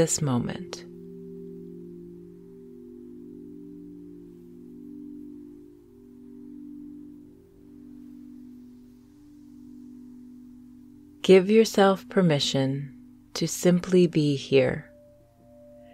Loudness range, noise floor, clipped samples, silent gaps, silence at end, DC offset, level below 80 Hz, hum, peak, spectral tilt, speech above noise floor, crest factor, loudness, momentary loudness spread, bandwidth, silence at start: 24 LU; -55 dBFS; under 0.1%; none; 1.1 s; under 0.1%; -62 dBFS; none; -6 dBFS; -5.5 dB/octave; 33 dB; 22 dB; -23 LUFS; 26 LU; 15.5 kHz; 0 s